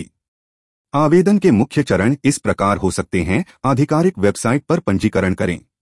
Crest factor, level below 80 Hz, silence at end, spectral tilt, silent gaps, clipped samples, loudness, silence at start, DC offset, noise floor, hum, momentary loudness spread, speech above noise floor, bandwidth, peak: 14 dB; -46 dBFS; 0.2 s; -6.5 dB/octave; 0.28-0.85 s; under 0.1%; -17 LUFS; 0 s; under 0.1%; under -90 dBFS; none; 6 LU; over 74 dB; 12 kHz; -2 dBFS